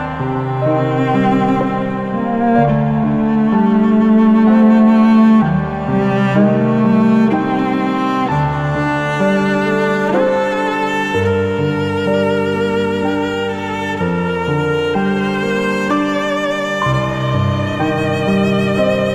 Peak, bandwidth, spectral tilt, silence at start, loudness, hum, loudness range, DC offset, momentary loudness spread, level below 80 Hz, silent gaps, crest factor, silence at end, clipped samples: 0 dBFS; 8.8 kHz; -7.5 dB/octave; 0 s; -15 LUFS; none; 5 LU; under 0.1%; 7 LU; -44 dBFS; none; 14 dB; 0 s; under 0.1%